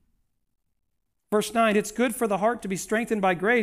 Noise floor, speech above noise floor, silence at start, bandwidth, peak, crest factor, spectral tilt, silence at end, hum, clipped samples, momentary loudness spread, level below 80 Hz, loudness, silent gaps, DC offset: -78 dBFS; 54 dB; 1.3 s; 16 kHz; -10 dBFS; 16 dB; -4.5 dB/octave; 0 s; none; under 0.1%; 5 LU; -60 dBFS; -25 LUFS; none; under 0.1%